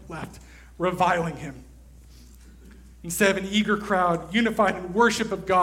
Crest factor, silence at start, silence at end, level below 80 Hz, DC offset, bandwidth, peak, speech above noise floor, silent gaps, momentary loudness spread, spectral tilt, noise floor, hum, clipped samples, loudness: 18 dB; 0 s; 0 s; -48 dBFS; under 0.1%; 16.5 kHz; -6 dBFS; 24 dB; none; 16 LU; -4.5 dB/octave; -48 dBFS; none; under 0.1%; -23 LUFS